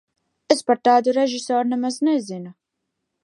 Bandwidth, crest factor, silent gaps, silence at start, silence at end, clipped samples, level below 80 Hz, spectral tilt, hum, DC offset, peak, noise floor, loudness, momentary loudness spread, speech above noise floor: 11.5 kHz; 20 dB; none; 0.5 s; 0.7 s; under 0.1%; -78 dBFS; -4 dB/octave; none; under 0.1%; -2 dBFS; -79 dBFS; -20 LUFS; 15 LU; 59 dB